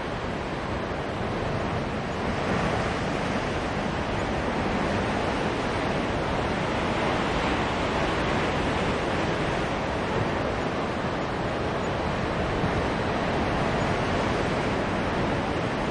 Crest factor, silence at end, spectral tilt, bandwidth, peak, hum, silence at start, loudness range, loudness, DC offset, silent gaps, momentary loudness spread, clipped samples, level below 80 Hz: 14 dB; 0 s; -6 dB/octave; 11.5 kHz; -14 dBFS; none; 0 s; 2 LU; -27 LUFS; under 0.1%; none; 3 LU; under 0.1%; -40 dBFS